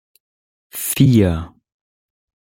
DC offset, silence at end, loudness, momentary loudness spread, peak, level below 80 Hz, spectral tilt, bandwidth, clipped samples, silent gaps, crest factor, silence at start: under 0.1%; 1.1 s; -16 LUFS; 20 LU; -2 dBFS; -44 dBFS; -6 dB/octave; 17 kHz; under 0.1%; none; 18 dB; 0.75 s